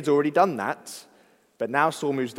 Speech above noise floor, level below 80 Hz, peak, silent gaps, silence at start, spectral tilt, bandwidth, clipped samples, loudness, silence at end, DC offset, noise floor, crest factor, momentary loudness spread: 35 dB; -76 dBFS; -6 dBFS; none; 0 s; -5.5 dB/octave; 16 kHz; under 0.1%; -24 LUFS; 0 s; under 0.1%; -59 dBFS; 20 dB; 16 LU